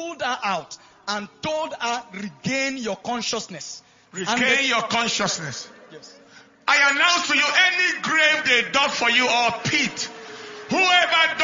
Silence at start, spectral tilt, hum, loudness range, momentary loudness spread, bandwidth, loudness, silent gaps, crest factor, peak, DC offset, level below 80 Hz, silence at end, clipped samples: 0 s; -1.5 dB/octave; none; 9 LU; 18 LU; 7.6 kHz; -20 LUFS; none; 20 dB; -4 dBFS; under 0.1%; -62 dBFS; 0 s; under 0.1%